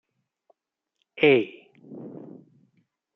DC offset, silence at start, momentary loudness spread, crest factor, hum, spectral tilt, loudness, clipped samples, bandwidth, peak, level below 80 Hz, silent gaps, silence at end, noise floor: under 0.1%; 1.2 s; 27 LU; 22 dB; none; -8 dB/octave; -22 LUFS; under 0.1%; 5.8 kHz; -6 dBFS; -76 dBFS; none; 1.05 s; -82 dBFS